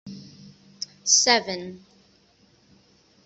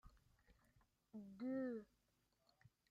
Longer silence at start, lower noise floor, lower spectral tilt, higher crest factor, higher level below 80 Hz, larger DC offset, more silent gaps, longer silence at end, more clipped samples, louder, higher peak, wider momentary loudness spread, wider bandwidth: about the same, 0.05 s vs 0.05 s; second, -60 dBFS vs -84 dBFS; second, 0 dB/octave vs -8 dB/octave; first, 24 dB vs 18 dB; first, -70 dBFS vs -78 dBFS; neither; neither; first, 1.5 s vs 1.05 s; neither; first, -20 LUFS vs -49 LUFS; first, -4 dBFS vs -36 dBFS; first, 25 LU vs 14 LU; about the same, 8.2 kHz vs 7.6 kHz